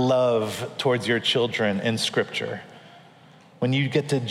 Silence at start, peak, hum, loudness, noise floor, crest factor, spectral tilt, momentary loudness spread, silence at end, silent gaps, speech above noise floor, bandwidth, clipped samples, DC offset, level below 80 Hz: 0 s; -8 dBFS; none; -24 LUFS; -51 dBFS; 16 dB; -5 dB/octave; 8 LU; 0 s; none; 28 dB; 15.5 kHz; under 0.1%; under 0.1%; -72 dBFS